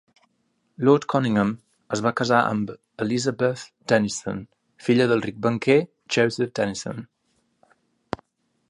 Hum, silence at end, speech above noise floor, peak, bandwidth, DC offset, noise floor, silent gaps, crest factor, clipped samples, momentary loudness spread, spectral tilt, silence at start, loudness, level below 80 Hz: none; 1.65 s; 48 dB; -4 dBFS; 11.5 kHz; under 0.1%; -70 dBFS; none; 20 dB; under 0.1%; 15 LU; -5.5 dB/octave; 0.8 s; -23 LUFS; -60 dBFS